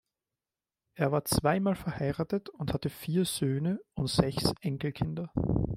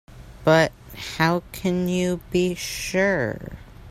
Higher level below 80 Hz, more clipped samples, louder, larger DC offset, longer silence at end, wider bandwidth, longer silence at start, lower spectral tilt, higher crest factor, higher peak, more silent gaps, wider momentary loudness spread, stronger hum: about the same, -48 dBFS vs -46 dBFS; neither; second, -31 LUFS vs -23 LUFS; neither; about the same, 0 s vs 0 s; about the same, 16 kHz vs 16 kHz; first, 0.95 s vs 0.1 s; about the same, -5.5 dB/octave vs -5 dB/octave; about the same, 24 dB vs 20 dB; about the same, -6 dBFS vs -4 dBFS; neither; second, 7 LU vs 16 LU; neither